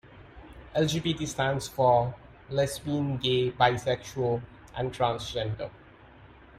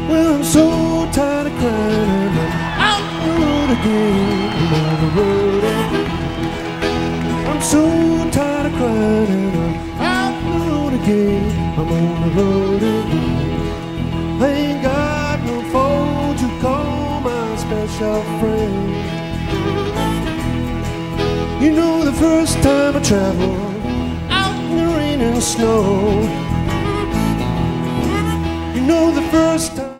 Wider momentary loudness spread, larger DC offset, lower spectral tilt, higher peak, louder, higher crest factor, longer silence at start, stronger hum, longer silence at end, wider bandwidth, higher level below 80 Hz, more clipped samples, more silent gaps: first, 11 LU vs 7 LU; neither; about the same, -5 dB/octave vs -5.5 dB/octave; second, -10 dBFS vs 0 dBFS; second, -28 LUFS vs -17 LUFS; about the same, 20 dB vs 16 dB; about the same, 0.05 s vs 0 s; neither; first, 0.35 s vs 0 s; about the same, 15.5 kHz vs 16 kHz; second, -52 dBFS vs -30 dBFS; neither; neither